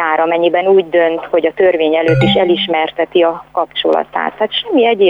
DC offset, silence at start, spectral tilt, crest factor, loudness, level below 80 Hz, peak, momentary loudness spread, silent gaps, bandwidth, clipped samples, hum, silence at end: under 0.1%; 0 s; -7.5 dB/octave; 10 dB; -13 LUFS; -46 dBFS; -2 dBFS; 5 LU; none; 7.4 kHz; under 0.1%; none; 0 s